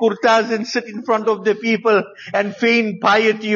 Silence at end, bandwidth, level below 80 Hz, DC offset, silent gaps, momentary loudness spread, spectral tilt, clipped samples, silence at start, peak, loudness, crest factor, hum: 0 s; 7.4 kHz; -70 dBFS; under 0.1%; none; 7 LU; -2.5 dB/octave; under 0.1%; 0 s; -4 dBFS; -17 LUFS; 14 dB; none